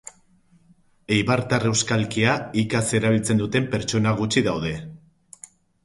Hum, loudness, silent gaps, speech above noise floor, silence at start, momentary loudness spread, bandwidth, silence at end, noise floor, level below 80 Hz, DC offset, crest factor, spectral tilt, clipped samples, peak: none; -22 LUFS; none; 36 dB; 1.1 s; 7 LU; 11.5 kHz; 0.9 s; -58 dBFS; -50 dBFS; under 0.1%; 18 dB; -4.5 dB/octave; under 0.1%; -4 dBFS